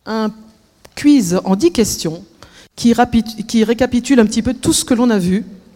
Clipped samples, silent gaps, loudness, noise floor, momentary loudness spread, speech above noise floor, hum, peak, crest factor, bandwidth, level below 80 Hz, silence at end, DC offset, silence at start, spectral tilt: under 0.1%; none; -15 LUFS; -47 dBFS; 8 LU; 33 dB; none; 0 dBFS; 16 dB; 16.5 kHz; -40 dBFS; 0.2 s; under 0.1%; 0.05 s; -5 dB/octave